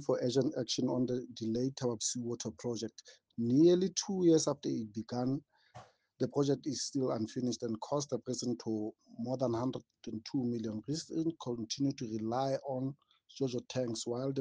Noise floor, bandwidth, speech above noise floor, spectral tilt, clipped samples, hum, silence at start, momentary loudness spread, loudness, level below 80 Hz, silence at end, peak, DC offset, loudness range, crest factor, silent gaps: -57 dBFS; 10 kHz; 23 dB; -5.5 dB/octave; under 0.1%; none; 0 s; 10 LU; -35 LUFS; -74 dBFS; 0 s; -16 dBFS; under 0.1%; 5 LU; 18 dB; none